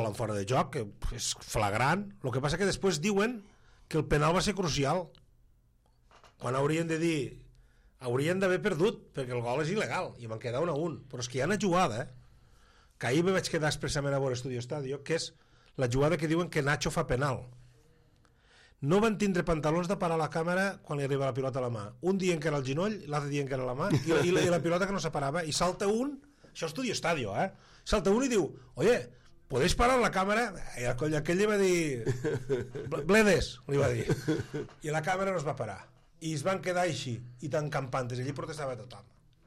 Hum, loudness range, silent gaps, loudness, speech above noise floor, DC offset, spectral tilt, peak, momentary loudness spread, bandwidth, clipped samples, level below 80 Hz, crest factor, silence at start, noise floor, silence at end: none; 4 LU; none; -31 LUFS; 35 dB; under 0.1%; -5 dB/octave; -14 dBFS; 10 LU; 16 kHz; under 0.1%; -50 dBFS; 18 dB; 0 s; -66 dBFS; 0.45 s